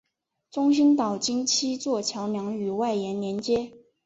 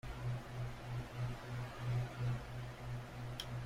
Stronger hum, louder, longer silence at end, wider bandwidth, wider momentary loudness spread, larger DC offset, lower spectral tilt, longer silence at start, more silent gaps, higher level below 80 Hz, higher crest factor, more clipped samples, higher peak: neither; first, -25 LUFS vs -44 LUFS; first, 0.3 s vs 0 s; second, 8 kHz vs 15.5 kHz; first, 9 LU vs 6 LU; neither; second, -4 dB/octave vs -6 dB/octave; first, 0.55 s vs 0.05 s; neither; second, -66 dBFS vs -54 dBFS; about the same, 14 dB vs 16 dB; neither; first, -12 dBFS vs -26 dBFS